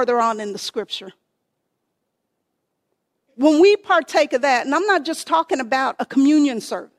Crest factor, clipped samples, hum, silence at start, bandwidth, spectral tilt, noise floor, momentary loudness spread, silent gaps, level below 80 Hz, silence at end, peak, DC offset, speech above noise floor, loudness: 18 dB; under 0.1%; none; 0 s; 13.5 kHz; -3 dB/octave; -75 dBFS; 13 LU; none; -70 dBFS; 0.15 s; -2 dBFS; under 0.1%; 57 dB; -18 LUFS